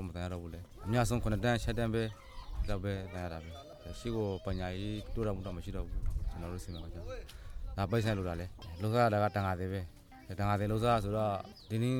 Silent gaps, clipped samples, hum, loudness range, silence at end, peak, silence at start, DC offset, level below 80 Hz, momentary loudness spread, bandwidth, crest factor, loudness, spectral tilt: none; under 0.1%; none; 6 LU; 0 s; -16 dBFS; 0 s; under 0.1%; -44 dBFS; 16 LU; 17 kHz; 18 dB; -36 LUFS; -6.5 dB/octave